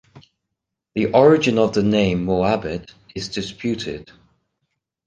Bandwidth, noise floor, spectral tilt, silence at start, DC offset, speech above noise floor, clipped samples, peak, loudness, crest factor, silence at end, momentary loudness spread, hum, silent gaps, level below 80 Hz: 9.2 kHz; -81 dBFS; -6 dB/octave; 0.15 s; under 0.1%; 62 dB; under 0.1%; -2 dBFS; -19 LUFS; 20 dB; 1.05 s; 17 LU; none; none; -46 dBFS